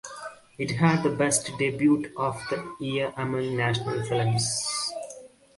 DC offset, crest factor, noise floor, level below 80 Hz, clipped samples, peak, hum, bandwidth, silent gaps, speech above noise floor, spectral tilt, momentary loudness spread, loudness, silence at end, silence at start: under 0.1%; 20 dB; -47 dBFS; -60 dBFS; under 0.1%; -8 dBFS; none; 11.5 kHz; none; 21 dB; -4.5 dB/octave; 15 LU; -26 LUFS; 0.3 s; 0.05 s